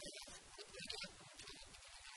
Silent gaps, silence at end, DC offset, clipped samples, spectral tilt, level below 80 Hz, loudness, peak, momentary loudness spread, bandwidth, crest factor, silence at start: none; 0 s; under 0.1%; under 0.1%; -1 dB/octave; -70 dBFS; -52 LUFS; -30 dBFS; 8 LU; 12.5 kHz; 24 dB; 0 s